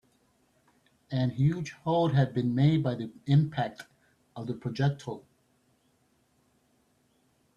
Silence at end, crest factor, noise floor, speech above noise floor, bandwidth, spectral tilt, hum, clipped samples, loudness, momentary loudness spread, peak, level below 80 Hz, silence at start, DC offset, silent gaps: 2.4 s; 18 dB; -70 dBFS; 42 dB; 7.2 kHz; -8 dB/octave; none; under 0.1%; -29 LUFS; 16 LU; -12 dBFS; -64 dBFS; 1.1 s; under 0.1%; none